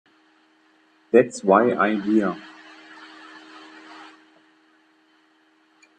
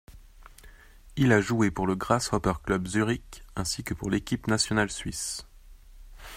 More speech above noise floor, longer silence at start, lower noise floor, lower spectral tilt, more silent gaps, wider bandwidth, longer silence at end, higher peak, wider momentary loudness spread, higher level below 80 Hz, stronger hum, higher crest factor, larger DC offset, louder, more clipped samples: first, 42 dB vs 24 dB; first, 1.15 s vs 0.1 s; first, -61 dBFS vs -51 dBFS; first, -6 dB/octave vs -4.5 dB/octave; neither; second, 9.6 kHz vs 16 kHz; first, 1.95 s vs 0 s; first, -2 dBFS vs -6 dBFS; first, 26 LU vs 11 LU; second, -68 dBFS vs -46 dBFS; neither; about the same, 24 dB vs 22 dB; neither; first, -20 LUFS vs -27 LUFS; neither